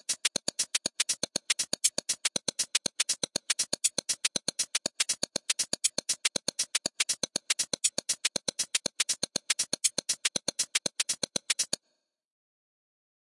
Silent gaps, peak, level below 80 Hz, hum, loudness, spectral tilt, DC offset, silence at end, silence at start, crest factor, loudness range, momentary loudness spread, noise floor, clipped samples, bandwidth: none; -8 dBFS; -74 dBFS; none; -29 LUFS; 0.5 dB/octave; under 0.1%; 1.5 s; 0.1 s; 26 dB; 1 LU; 3 LU; -79 dBFS; under 0.1%; 11.5 kHz